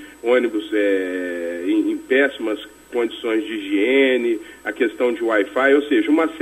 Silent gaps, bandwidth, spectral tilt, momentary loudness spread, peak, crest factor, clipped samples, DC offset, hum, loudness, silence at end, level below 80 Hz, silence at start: none; 13.5 kHz; -4 dB/octave; 10 LU; -4 dBFS; 16 dB; under 0.1%; under 0.1%; none; -20 LUFS; 0 s; -60 dBFS; 0 s